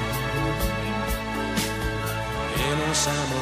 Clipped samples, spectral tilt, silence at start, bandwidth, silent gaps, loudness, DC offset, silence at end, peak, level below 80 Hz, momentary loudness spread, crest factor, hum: under 0.1%; -4 dB/octave; 0 s; 15.5 kHz; none; -26 LUFS; under 0.1%; 0 s; -10 dBFS; -36 dBFS; 5 LU; 14 dB; none